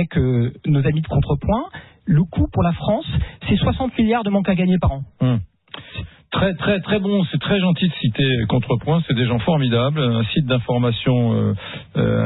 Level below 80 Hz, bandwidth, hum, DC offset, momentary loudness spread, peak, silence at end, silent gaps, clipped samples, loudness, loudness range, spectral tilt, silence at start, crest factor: -36 dBFS; 4.1 kHz; none; under 0.1%; 7 LU; -8 dBFS; 0 s; none; under 0.1%; -19 LUFS; 2 LU; -12.5 dB/octave; 0 s; 12 dB